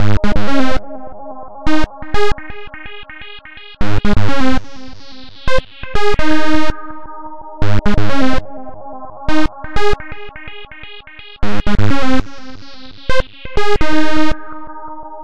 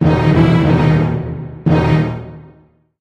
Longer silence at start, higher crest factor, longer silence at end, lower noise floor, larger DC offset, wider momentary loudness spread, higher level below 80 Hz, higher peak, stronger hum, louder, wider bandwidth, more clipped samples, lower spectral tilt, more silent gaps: about the same, 0 s vs 0 s; about the same, 10 dB vs 14 dB; second, 0 s vs 0.6 s; second, -37 dBFS vs -49 dBFS; first, 20% vs under 0.1%; first, 17 LU vs 13 LU; about the same, -26 dBFS vs -30 dBFS; about the same, 0 dBFS vs 0 dBFS; neither; second, -19 LUFS vs -14 LUFS; first, 9.2 kHz vs 6.6 kHz; neither; second, -6 dB/octave vs -9 dB/octave; neither